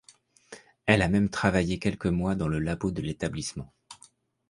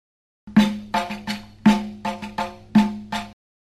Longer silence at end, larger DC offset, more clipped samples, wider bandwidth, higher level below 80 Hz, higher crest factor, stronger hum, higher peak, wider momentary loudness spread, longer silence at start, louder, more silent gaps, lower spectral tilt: about the same, 0.55 s vs 0.45 s; neither; neither; second, 11.5 kHz vs 13 kHz; about the same, -46 dBFS vs -48 dBFS; first, 26 dB vs 20 dB; neither; about the same, -2 dBFS vs -4 dBFS; about the same, 11 LU vs 12 LU; about the same, 0.5 s vs 0.45 s; second, -27 LUFS vs -23 LUFS; neither; about the same, -6 dB/octave vs -6 dB/octave